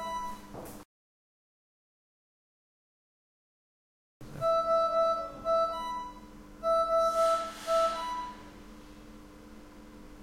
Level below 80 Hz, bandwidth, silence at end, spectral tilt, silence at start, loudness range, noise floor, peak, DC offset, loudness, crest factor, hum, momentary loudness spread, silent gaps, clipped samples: -58 dBFS; 16 kHz; 0 s; -4 dB/octave; 0 s; 6 LU; -50 dBFS; -18 dBFS; under 0.1%; -30 LUFS; 16 dB; none; 25 LU; 0.85-4.20 s; under 0.1%